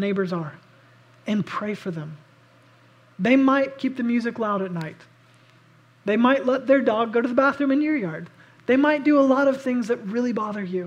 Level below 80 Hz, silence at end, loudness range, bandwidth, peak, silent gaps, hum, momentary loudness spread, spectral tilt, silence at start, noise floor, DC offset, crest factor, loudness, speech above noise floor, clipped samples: -74 dBFS; 0 s; 4 LU; 8.8 kHz; -4 dBFS; none; none; 14 LU; -7 dB/octave; 0 s; -55 dBFS; under 0.1%; 18 dB; -22 LUFS; 33 dB; under 0.1%